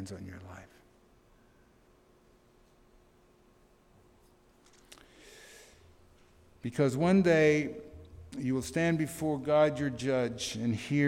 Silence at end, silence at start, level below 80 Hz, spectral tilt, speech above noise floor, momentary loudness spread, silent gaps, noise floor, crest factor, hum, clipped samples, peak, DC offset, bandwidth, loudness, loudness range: 0 s; 0 s; -62 dBFS; -6 dB/octave; 34 dB; 27 LU; none; -63 dBFS; 20 dB; none; under 0.1%; -14 dBFS; under 0.1%; 16.5 kHz; -29 LUFS; 11 LU